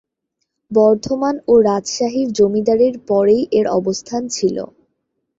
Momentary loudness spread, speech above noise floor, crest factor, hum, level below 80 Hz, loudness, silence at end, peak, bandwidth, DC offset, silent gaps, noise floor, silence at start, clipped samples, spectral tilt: 8 LU; 59 dB; 14 dB; none; -54 dBFS; -16 LUFS; 0.75 s; -2 dBFS; 8 kHz; under 0.1%; none; -74 dBFS; 0.7 s; under 0.1%; -5 dB/octave